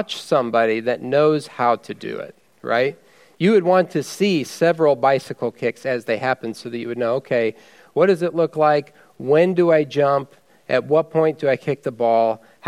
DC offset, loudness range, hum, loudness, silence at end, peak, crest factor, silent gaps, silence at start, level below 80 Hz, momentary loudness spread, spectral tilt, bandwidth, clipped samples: under 0.1%; 3 LU; none; -19 LUFS; 0 s; -2 dBFS; 16 dB; none; 0 s; -72 dBFS; 11 LU; -6 dB/octave; 14.5 kHz; under 0.1%